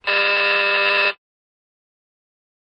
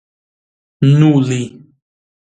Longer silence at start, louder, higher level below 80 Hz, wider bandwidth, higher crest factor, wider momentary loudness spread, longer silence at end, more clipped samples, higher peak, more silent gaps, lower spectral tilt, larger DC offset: second, 0.05 s vs 0.8 s; second, -16 LUFS vs -13 LUFS; second, -72 dBFS vs -56 dBFS; about the same, 9.8 kHz vs 9.2 kHz; about the same, 14 dB vs 16 dB; second, 5 LU vs 12 LU; first, 1.5 s vs 0.9 s; neither; second, -8 dBFS vs 0 dBFS; neither; second, -2.5 dB/octave vs -7.5 dB/octave; neither